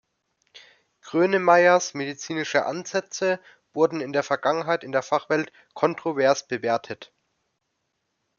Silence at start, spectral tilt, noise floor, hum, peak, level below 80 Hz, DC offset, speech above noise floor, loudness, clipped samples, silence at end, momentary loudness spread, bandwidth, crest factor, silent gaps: 1.05 s; -4 dB/octave; -77 dBFS; none; -4 dBFS; -76 dBFS; under 0.1%; 54 dB; -23 LUFS; under 0.1%; 1.35 s; 12 LU; 7.2 kHz; 20 dB; none